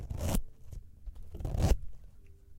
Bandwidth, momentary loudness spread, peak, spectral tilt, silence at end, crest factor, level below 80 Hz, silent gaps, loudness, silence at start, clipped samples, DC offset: 16.5 kHz; 21 LU; -14 dBFS; -6 dB/octave; 0 s; 20 dB; -38 dBFS; none; -35 LUFS; 0 s; under 0.1%; under 0.1%